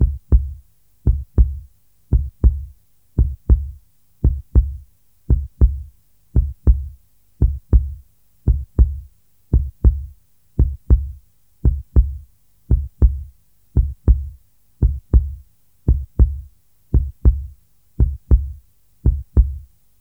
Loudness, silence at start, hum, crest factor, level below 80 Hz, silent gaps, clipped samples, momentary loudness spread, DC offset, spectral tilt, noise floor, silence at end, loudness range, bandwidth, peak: -21 LUFS; 0 s; none; 18 dB; -20 dBFS; none; under 0.1%; 16 LU; 0.2%; -12 dB/octave; -48 dBFS; 0.4 s; 1 LU; 1.5 kHz; -2 dBFS